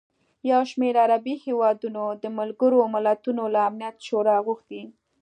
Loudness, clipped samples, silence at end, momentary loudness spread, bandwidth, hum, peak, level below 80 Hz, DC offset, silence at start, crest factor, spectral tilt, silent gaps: -23 LUFS; under 0.1%; 0.3 s; 11 LU; 9.4 kHz; none; -8 dBFS; -82 dBFS; under 0.1%; 0.45 s; 16 dB; -6 dB/octave; none